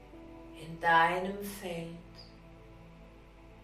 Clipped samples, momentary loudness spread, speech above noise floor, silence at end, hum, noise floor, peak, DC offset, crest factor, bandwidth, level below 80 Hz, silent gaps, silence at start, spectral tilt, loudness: under 0.1%; 28 LU; 23 dB; 0 s; none; -54 dBFS; -14 dBFS; under 0.1%; 22 dB; 15.5 kHz; -58 dBFS; none; 0 s; -4.5 dB/octave; -30 LUFS